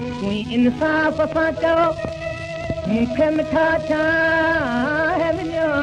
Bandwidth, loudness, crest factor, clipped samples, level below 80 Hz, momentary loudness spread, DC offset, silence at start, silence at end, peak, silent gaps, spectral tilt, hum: 9.8 kHz; -19 LUFS; 12 dB; under 0.1%; -42 dBFS; 9 LU; under 0.1%; 0 s; 0 s; -8 dBFS; none; -6.5 dB/octave; none